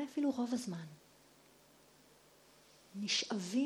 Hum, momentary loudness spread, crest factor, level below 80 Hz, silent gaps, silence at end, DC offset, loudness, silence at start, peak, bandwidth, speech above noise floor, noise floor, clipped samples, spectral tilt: none; 18 LU; 18 dB; -82 dBFS; none; 0 s; under 0.1%; -38 LUFS; 0 s; -22 dBFS; 18 kHz; 28 dB; -65 dBFS; under 0.1%; -3.5 dB/octave